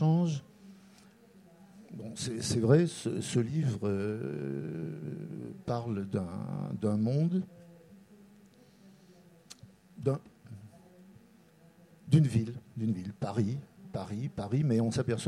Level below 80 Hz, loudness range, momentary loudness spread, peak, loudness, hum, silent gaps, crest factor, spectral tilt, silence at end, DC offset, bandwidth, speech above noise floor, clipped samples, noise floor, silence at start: -66 dBFS; 11 LU; 19 LU; -10 dBFS; -32 LUFS; none; none; 22 dB; -7 dB/octave; 0 s; under 0.1%; 12.5 kHz; 29 dB; under 0.1%; -60 dBFS; 0 s